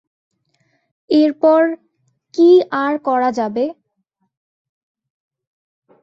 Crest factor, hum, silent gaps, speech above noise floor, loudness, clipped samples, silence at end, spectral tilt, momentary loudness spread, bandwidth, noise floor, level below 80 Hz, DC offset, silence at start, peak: 16 dB; none; none; 56 dB; -15 LUFS; under 0.1%; 2.3 s; -6 dB/octave; 12 LU; 7.2 kHz; -70 dBFS; -68 dBFS; under 0.1%; 1.1 s; -2 dBFS